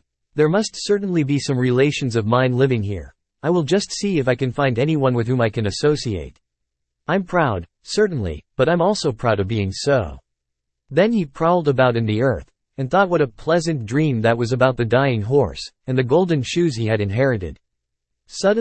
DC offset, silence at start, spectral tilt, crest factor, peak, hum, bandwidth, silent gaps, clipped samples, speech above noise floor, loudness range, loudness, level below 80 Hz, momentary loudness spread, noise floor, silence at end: under 0.1%; 0.35 s; -6 dB/octave; 16 dB; -2 dBFS; none; 8.8 kHz; none; under 0.1%; 60 dB; 2 LU; -19 LUFS; -46 dBFS; 9 LU; -78 dBFS; 0 s